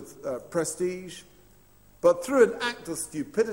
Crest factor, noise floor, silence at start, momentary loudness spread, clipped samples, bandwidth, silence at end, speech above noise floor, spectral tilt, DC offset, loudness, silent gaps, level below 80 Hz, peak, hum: 20 dB; -58 dBFS; 0 s; 15 LU; under 0.1%; 16 kHz; 0 s; 31 dB; -4 dB/octave; under 0.1%; -27 LUFS; none; -62 dBFS; -8 dBFS; none